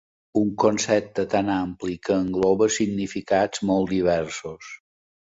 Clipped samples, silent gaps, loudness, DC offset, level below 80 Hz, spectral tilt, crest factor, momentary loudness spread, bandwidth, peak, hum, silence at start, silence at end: under 0.1%; none; -23 LUFS; under 0.1%; -52 dBFS; -5 dB/octave; 18 dB; 12 LU; 8 kHz; -6 dBFS; none; 0.35 s; 0.5 s